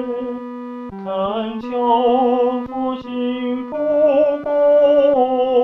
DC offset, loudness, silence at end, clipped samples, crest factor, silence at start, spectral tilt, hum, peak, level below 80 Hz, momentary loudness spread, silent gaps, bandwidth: under 0.1%; -17 LUFS; 0 s; under 0.1%; 12 dB; 0 s; -7.5 dB/octave; none; -4 dBFS; -54 dBFS; 14 LU; none; 4.4 kHz